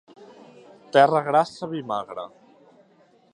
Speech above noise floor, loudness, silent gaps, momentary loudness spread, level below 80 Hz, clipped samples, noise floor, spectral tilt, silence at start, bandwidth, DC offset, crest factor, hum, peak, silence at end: 37 dB; -22 LUFS; none; 18 LU; -74 dBFS; under 0.1%; -58 dBFS; -5.5 dB/octave; 0.2 s; 10.5 kHz; under 0.1%; 22 dB; none; -4 dBFS; 1.05 s